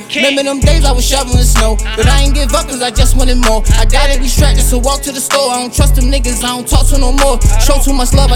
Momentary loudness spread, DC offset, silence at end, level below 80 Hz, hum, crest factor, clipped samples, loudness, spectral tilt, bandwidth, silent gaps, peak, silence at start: 3 LU; under 0.1%; 0 s; -10 dBFS; none; 8 dB; 0.3%; -11 LUFS; -4 dB/octave; 17 kHz; none; 0 dBFS; 0 s